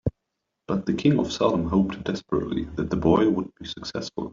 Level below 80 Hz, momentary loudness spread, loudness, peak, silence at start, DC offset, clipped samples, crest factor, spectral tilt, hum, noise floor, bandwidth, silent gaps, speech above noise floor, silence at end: -46 dBFS; 11 LU; -25 LUFS; -6 dBFS; 0.05 s; under 0.1%; under 0.1%; 18 dB; -7 dB/octave; none; -81 dBFS; 7.6 kHz; none; 57 dB; 0 s